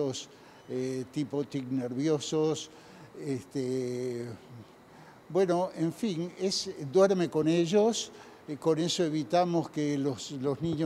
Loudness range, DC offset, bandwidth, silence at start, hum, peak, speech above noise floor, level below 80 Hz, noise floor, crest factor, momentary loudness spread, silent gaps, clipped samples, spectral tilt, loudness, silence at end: 6 LU; under 0.1%; 13.5 kHz; 0 s; none; -12 dBFS; 23 dB; -72 dBFS; -53 dBFS; 18 dB; 15 LU; none; under 0.1%; -5.5 dB/octave; -30 LUFS; 0 s